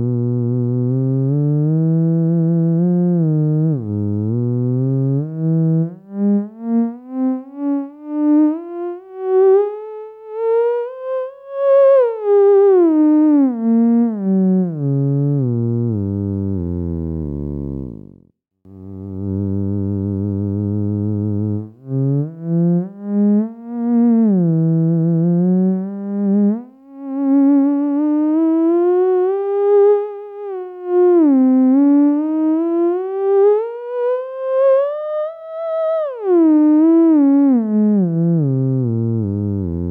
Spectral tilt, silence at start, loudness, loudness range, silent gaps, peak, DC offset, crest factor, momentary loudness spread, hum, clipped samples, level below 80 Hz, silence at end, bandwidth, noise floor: -13 dB/octave; 0 s; -16 LUFS; 7 LU; none; -4 dBFS; under 0.1%; 12 dB; 12 LU; 60 Hz at -45 dBFS; under 0.1%; -48 dBFS; 0 s; 3.5 kHz; -52 dBFS